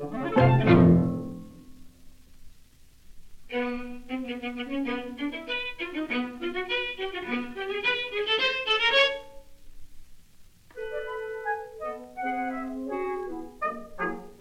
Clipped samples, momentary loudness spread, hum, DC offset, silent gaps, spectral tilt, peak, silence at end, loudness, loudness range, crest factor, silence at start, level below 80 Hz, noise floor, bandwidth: under 0.1%; 16 LU; none; under 0.1%; none; -6.5 dB/octave; -6 dBFS; 0.05 s; -27 LUFS; 10 LU; 22 dB; 0 s; -50 dBFS; -52 dBFS; 10.5 kHz